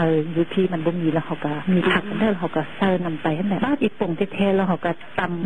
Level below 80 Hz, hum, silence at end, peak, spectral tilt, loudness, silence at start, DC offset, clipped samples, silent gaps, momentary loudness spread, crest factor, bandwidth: -52 dBFS; none; 0 s; -6 dBFS; -8.5 dB/octave; -22 LUFS; 0 s; 2%; under 0.1%; none; 6 LU; 16 dB; 9.6 kHz